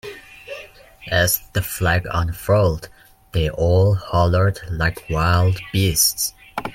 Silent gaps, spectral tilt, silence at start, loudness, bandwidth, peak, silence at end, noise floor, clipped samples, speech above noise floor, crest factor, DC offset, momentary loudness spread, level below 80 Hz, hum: none; -4.5 dB/octave; 0.05 s; -19 LUFS; 16.5 kHz; -2 dBFS; 0 s; -41 dBFS; under 0.1%; 22 dB; 18 dB; under 0.1%; 19 LU; -36 dBFS; none